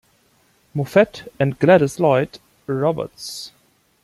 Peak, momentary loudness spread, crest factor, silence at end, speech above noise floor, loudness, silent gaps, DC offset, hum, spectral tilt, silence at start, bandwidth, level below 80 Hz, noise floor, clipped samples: -2 dBFS; 16 LU; 18 dB; 0.55 s; 41 dB; -19 LUFS; none; under 0.1%; none; -6.5 dB/octave; 0.75 s; 15 kHz; -58 dBFS; -59 dBFS; under 0.1%